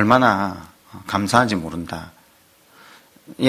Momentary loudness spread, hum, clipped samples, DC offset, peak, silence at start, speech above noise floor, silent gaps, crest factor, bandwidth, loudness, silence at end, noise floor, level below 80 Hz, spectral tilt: 23 LU; none; under 0.1%; under 0.1%; 0 dBFS; 0 s; 35 dB; none; 22 dB; 16 kHz; -20 LUFS; 0 s; -54 dBFS; -50 dBFS; -5.5 dB/octave